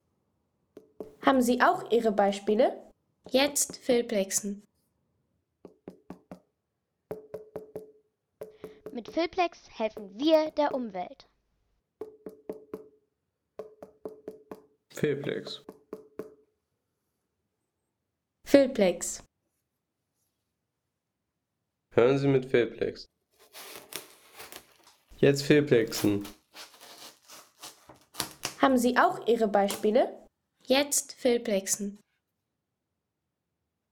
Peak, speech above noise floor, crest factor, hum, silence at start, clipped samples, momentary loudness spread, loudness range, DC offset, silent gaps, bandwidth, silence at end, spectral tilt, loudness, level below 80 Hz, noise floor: -6 dBFS; 58 dB; 24 dB; none; 1 s; under 0.1%; 23 LU; 19 LU; under 0.1%; none; over 20 kHz; 1.95 s; -4 dB/octave; -27 LUFS; -66 dBFS; -84 dBFS